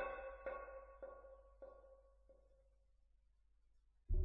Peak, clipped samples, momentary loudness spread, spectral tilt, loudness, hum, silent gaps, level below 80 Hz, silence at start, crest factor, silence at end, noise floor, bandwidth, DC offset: -30 dBFS; under 0.1%; 17 LU; -6.5 dB/octave; -53 LUFS; none; none; -52 dBFS; 0 s; 20 dB; 0 s; -75 dBFS; 3.9 kHz; under 0.1%